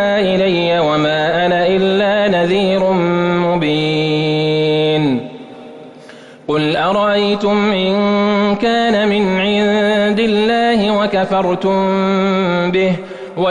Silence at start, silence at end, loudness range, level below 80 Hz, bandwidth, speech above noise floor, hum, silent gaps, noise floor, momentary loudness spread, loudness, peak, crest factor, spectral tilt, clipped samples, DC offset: 0 s; 0 s; 3 LU; -48 dBFS; 9.8 kHz; 24 dB; none; none; -37 dBFS; 3 LU; -14 LUFS; -6 dBFS; 10 dB; -6.5 dB/octave; under 0.1%; under 0.1%